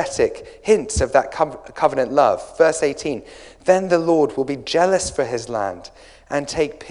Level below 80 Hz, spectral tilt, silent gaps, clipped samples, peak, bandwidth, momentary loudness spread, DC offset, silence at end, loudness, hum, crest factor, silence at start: -42 dBFS; -4.5 dB/octave; none; under 0.1%; -2 dBFS; 11 kHz; 9 LU; under 0.1%; 0 s; -20 LUFS; none; 18 dB; 0 s